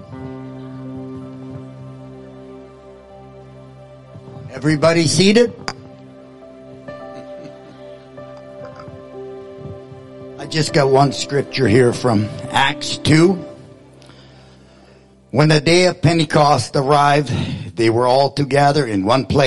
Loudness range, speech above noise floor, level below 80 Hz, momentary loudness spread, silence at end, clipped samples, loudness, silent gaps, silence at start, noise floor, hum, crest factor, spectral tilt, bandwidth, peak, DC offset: 20 LU; 33 dB; -50 dBFS; 24 LU; 0 s; under 0.1%; -15 LUFS; none; 0 s; -47 dBFS; none; 16 dB; -5.5 dB/octave; 11.5 kHz; -2 dBFS; under 0.1%